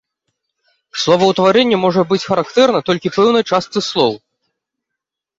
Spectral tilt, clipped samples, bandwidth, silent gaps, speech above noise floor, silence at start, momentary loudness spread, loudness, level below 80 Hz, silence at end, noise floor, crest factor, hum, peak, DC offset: -5 dB/octave; under 0.1%; 7.8 kHz; none; 67 dB; 0.95 s; 7 LU; -14 LUFS; -58 dBFS; 1.2 s; -81 dBFS; 16 dB; none; 0 dBFS; under 0.1%